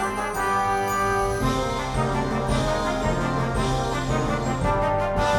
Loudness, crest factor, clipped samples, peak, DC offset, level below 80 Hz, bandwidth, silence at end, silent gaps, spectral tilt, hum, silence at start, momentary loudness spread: -24 LUFS; 12 dB; under 0.1%; -10 dBFS; under 0.1%; -34 dBFS; 17.5 kHz; 0 s; none; -5.5 dB/octave; none; 0 s; 3 LU